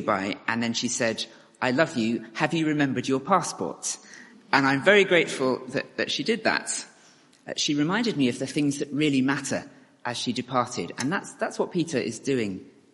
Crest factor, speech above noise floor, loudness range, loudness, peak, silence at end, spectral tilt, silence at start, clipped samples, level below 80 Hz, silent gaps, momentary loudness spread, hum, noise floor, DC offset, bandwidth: 24 dB; 31 dB; 4 LU; -25 LUFS; -2 dBFS; 0.25 s; -4 dB/octave; 0 s; under 0.1%; -68 dBFS; none; 10 LU; none; -56 dBFS; under 0.1%; 11.5 kHz